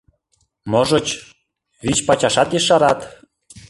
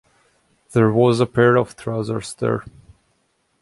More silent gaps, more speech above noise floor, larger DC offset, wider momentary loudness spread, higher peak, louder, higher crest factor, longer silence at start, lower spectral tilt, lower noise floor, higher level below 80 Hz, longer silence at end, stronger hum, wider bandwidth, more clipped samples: neither; about the same, 49 dB vs 49 dB; neither; first, 14 LU vs 11 LU; about the same, -2 dBFS vs -2 dBFS; about the same, -17 LUFS vs -19 LUFS; about the same, 18 dB vs 18 dB; about the same, 0.65 s vs 0.7 s; second, -3.5 dB/octave vs -7 dB/octave; about the same, -66 dBFS vs -66 dBFS; first, -48 dBFS vs -54 dBFS; second, 0.1 s vs 0.9 s; neither; about the same, 11.5 kHz vs 11.5 kHz; neither